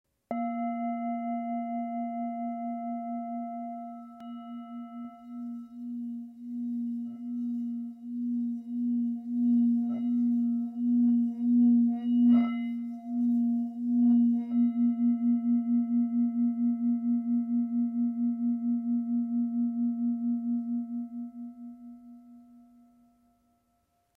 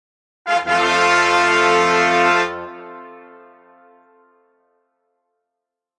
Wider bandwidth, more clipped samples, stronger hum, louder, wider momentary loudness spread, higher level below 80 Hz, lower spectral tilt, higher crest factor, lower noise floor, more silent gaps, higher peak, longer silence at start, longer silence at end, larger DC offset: second, 3.1 kHz vs 11.5 kHz; neither; neither; second, -29 LUFS vs -15 LUFS; second, 16 LU vs 21 LU; second, -82 dBFS vs -66 dBFS; first, -10 dB/octave vs -2.5 dB/octave; about the same, 14 dB vs 18 dB; second, -73 dBFS vs -82 dBFS; neither; second, -16 dBFS vs -2 dBFS; second, 0.3 s vs 0.45 s; second, 1.6 s vs 2.8 s; neither